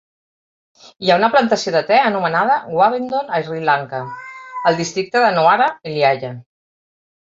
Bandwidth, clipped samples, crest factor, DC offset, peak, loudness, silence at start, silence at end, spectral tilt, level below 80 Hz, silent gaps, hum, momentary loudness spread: 7.8 kHz; under 0.1%; 16 dB; under 0.1%; -2 dBFS; -16 LUFS; 1 s; 0.95 s; -4.5 dB/octave; -64 dBFS; none; none; 14 LU